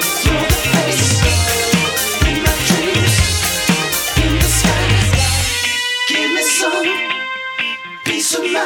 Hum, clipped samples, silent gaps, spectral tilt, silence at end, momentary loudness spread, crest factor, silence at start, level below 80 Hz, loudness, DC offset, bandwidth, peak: none; under 0.1%; none; -3 dB/octave; 0 s; 6 LU; 14 dB; 0 s; -24 dBFS; -14 LUFS; under 0.1%; over 20 kHz; 0 dBFS